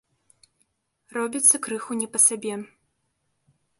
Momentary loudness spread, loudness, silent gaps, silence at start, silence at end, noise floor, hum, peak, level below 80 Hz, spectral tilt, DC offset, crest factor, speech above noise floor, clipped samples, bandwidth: 16 LU; -21 LUFS; none; 1.15 s; 1.15 s; -74 dBFS; none; -4 dBFS; -76 dBFS; -2 dB/octave; under 0.1%; 24 dB; 51 dB; under 0.1%; 12 kHz